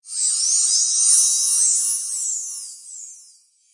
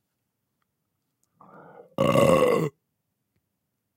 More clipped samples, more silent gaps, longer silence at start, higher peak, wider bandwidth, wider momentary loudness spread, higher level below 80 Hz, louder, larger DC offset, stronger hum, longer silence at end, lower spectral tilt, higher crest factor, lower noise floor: neither; neither; second, 0.05 s vs 2 s; first, -2 dBFS vs -6 dBFS; second, 11.5 kHz vs 16.5 kHz; first, 20 LU vs 14 LU; second, -78 dBFS vs -58 dBFS; first, -16 LUFS vs -22 LUFS; neither; neither; second, 0.55 s vs 1.25 s; second, 6 dB/octave vs -6 dB/octave; about the same, 18 dB vs 22 dB; second, -53 dBFS vs -79 dBFS